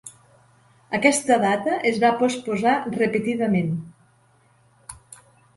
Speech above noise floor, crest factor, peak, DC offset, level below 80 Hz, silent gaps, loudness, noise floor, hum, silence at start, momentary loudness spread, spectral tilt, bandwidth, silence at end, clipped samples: 38 dB; 22 dB; -2 dBFS; under 0.1%; -60 dBFS; none; -21 LUFS; -59 dBFS; none; 0.05 s; 17 LU; -5 dB/octave; 11.5 kHz; 0.4 s; under 0.1%